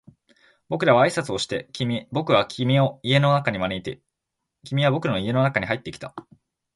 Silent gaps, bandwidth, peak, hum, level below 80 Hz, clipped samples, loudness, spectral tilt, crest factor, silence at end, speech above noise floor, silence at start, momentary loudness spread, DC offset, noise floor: none; 11.5 kHz; -4 dBFS; none; -56 dBFS; under 0.1%; -22 LUFS; -6 dB/octave; 20 dB; 0.55 s; 60 dB; 0.7 s; 16 LU; under 0.1%; -82 dBFS